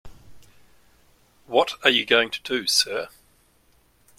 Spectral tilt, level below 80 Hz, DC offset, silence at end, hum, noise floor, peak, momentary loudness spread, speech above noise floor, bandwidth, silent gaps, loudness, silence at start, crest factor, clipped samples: -1 dB/octave; -58 dBFS; under 0.1%; 1.1 s; none; -61 dBFS; 0 dBFS; 9 LU; 39 dB; 16.5 kHz; none; -21 LUFS; 0.05 s; 26 dB; under 0.1%